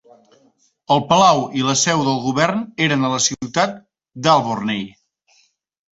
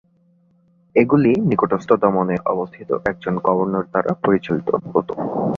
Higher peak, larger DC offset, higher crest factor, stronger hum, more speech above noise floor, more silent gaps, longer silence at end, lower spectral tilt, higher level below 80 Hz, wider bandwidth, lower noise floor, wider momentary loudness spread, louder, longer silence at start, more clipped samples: about the same, 0 dBFS vs -2 dBFS; neither; about the same, 18 dB vs 18 dB; neither; about the same, 42 dB vs 39 dB; neither; first, 1.05 s vs 0 s; second, -3.5 dB/octave vs -9.5 dB/octave; about the same, -58 dBFS vs -54 dBFS; first, 8.2 kHz vs 7.2 kHz; about the same, -59 dBFS vs -58 dBFS; about the same, 9 LU vs 7 LU; about the same, -17 LUFS vs -19 LUFS; about the same, 0.9 s vs 0.95 s; neither